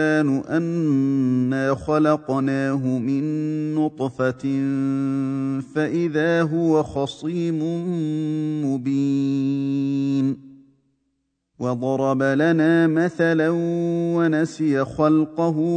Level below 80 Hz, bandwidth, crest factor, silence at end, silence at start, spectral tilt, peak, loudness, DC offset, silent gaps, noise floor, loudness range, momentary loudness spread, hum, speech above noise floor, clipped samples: -58 dBFS; 9.2 kHz; 16 dB; 0 s; 0 s; -8 dB/octave; -4 dBFS; -21 LUFS; under 0.1%; none; -73 dBFS; 4 LU; 6 LU; none; 53 dB; under 0.1%